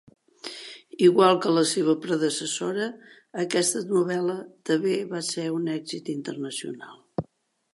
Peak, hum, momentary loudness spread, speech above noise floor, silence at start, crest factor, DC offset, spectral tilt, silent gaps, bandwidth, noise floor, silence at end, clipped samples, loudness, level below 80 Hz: -4 dBFS; none; 18 LU; 41 dB; 0.45 s; 20 dB; under 0.1%; -4 dB/octave; none; 11.5 kHz; -65 dBFS; 0.5 s; under 0.1%; -25 LUFS; -68 dBFS